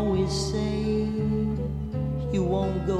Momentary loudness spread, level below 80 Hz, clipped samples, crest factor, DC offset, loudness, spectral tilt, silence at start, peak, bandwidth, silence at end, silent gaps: 5 LU; -36 dBFS; under 0.1%; 12 dB; under 0.1%; -27 LUFS; -7 dB/octave; 0 s; -14 dBFS; 11.5 kHz; 0 s; none